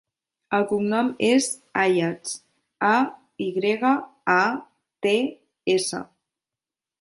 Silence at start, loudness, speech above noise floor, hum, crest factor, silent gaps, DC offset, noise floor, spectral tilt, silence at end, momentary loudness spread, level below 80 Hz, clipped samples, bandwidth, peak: 0.5 s; -23 LUFS; 68 dB; none; 20 dB; none; under 0.1%; -90 dBFS; -4 dB/octave; 0.95 s; 11 LU; -70 dBFS; under 0.1%; 11.5 kHz; -4 dBFS